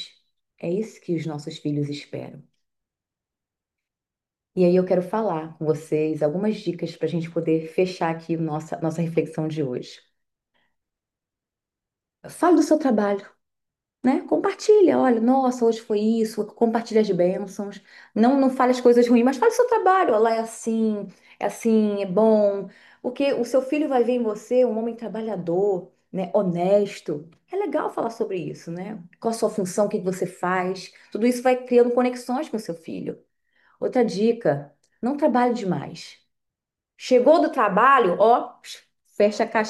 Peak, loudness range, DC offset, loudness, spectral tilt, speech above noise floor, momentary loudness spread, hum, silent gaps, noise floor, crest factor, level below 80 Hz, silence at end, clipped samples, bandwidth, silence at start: -6 dBFS; 8 LU; under 0.1%; -22 LUFS; -6.5 dB/octave; 68 dB; 15 LU; none; none; -89 dBFS; 18 dB; -72 dBFS; 0 s; under 0.1%; 12.5 kHz; 0 s